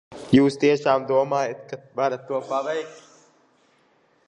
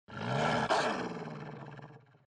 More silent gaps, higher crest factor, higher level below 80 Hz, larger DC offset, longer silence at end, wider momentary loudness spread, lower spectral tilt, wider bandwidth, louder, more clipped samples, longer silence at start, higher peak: neither; about the same, 22 dB vs 18 dB; first, -58 dBFS vs -66 dBFS; neither; first, 1.3 s vs 0.35 s; second, 13 LU vs 19 LU; first, -6.5 dB/octave vs -5 dB/octave; about the same, 10.5 kHz vs 11 kHz; first, -22 LUFS vs -33 LUFS; neither; about the same, 0.1 s vs 0.1 s; first, -2 dBFS vs -18 dBFS